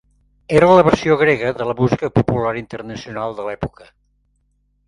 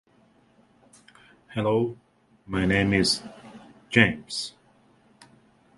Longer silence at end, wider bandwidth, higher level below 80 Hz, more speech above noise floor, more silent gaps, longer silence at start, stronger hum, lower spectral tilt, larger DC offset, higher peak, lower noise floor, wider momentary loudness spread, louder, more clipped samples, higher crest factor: about the same, 1.2 s vs 1.3 s; about the same, 11 kHz vs 11.5 kHz; first, -44 dBFS vs -50 dBFS; first, 47 dB vs 37 dB; neither; second, 0.5 s vs 1.5 s; first, 50 Hz at -50 dBFS vs none; first, -7 dB/octave vs -4.5 dB/octave; neither; about the same, 0 dBFS vs -2 dBFS; about the same, -63 dBFS vs -61 dBFS; about the same, 17 LU vs 16 LU; first, -16 LUFS vs -24 LUFS; neither; second, 18 dB vs 26 dB